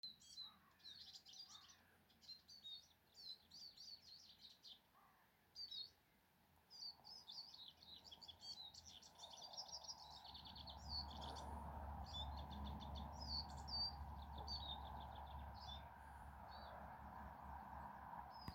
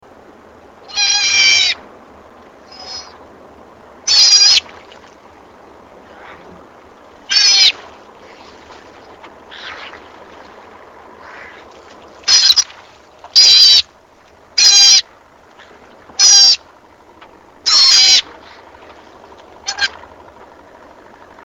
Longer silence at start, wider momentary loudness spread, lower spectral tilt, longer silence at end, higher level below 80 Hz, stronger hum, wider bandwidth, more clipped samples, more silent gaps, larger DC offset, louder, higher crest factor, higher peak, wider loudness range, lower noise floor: second, 0.05 s vs 0.9 s; second, 12 LU vs 24 LU; first, -3.5 dB/octave vs 3 dB/octave; second, 0 s vs 1.6 s; second, -62 dBFS vs -56 dBFS; neither; about the same, 16.5 kHz vs 18 kHz; neither; neither; neither; second, -54 LUFS vs -8 LUFS; about the same, 20 dB vs 16 dB; second, -36 dBFS vs 0 dBFS; about the same, 9 LU vs 7 LU; first, -77 dBFS vs -46 dBFS